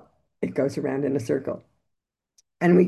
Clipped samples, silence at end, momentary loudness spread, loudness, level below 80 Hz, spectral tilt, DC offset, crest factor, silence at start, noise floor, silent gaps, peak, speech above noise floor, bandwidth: under 0.1%; 0 s; 9 LU; -26 LUFS; -64 dBFS; -8 dB/octave; under 0.1%; 20 dB; 0.4 s; -81 dBFS; none; -6 dBFS; 55 dB; 12 kHz